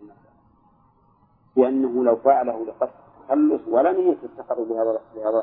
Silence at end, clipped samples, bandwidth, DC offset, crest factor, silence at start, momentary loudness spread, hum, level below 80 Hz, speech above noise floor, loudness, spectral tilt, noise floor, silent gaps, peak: 0 s; under 0.1%; 3.8 kHz; under 0.1%; 18 dB; 0 s; 10 LU; none; -68 dBFS; 39 dB; -22 LUFS; -11 dB/octave; -59 dBFS; none; -4 dBFS